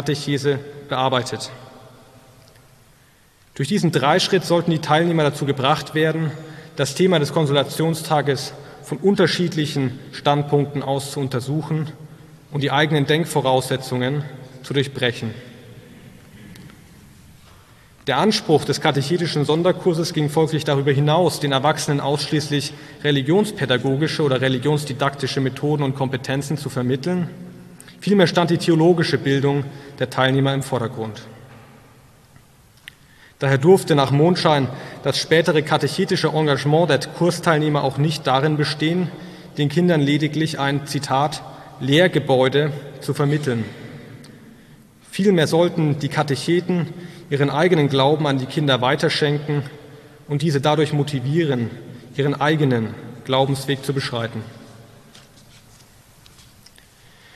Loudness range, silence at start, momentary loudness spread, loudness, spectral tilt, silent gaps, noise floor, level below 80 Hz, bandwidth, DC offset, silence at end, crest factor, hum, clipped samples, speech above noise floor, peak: 6 LU; 0 s; 12 LU; -20 LUFS; -5.5 dB/octave; none; -53 dBFS; -58 dBFS; 13.5 kHz; under 0.1%; 2.55 s; 18 dB; none; under 0.1%; 34 dB; -2 dBFS